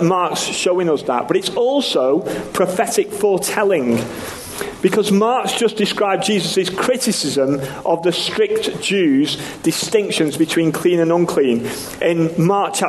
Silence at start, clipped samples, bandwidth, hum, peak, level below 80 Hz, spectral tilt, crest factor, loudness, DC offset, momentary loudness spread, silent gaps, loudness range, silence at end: 0 s; under 0.1%; 13 kHz; none; -2 dBFS; -54 dBFS; -4.5 dB/octave; 16 dB; -17 LUFS; under 0.1%; 5 LU; none; 1 LU; 0 s